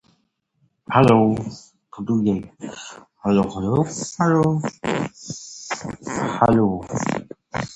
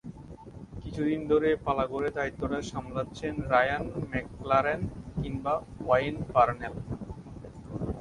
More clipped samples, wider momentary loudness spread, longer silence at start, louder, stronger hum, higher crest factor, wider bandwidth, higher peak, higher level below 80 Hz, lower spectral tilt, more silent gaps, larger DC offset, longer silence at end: neither; about the same, 17 LU vs 18 LU; first, 0.9 s vs 0.05 s; first, -21 LUFS vs -30 LUFS; neither; about the same, 22 dB vs 20 dB; about the same, 10.5 kHz vs 11 kHz; first, 0 dBFS vs -10 dBFS; about the same, -48 dBFS vs -48 dBFS; about the same, -6.5 dB/octave vs -7 dB/octave; neither; neither; about the same, 0 s vs 0 s